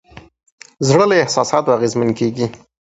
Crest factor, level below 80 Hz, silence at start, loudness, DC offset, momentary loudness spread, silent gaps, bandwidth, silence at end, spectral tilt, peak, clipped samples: 16 dB; -54 dBFS; 0.15 s; -16 LUFS; under 0.1%; 9 LU; 0.52-0.58 s; 8.2 kHz; 0.35 s; -5 dB/octave; 0 dBFS; under 0.1%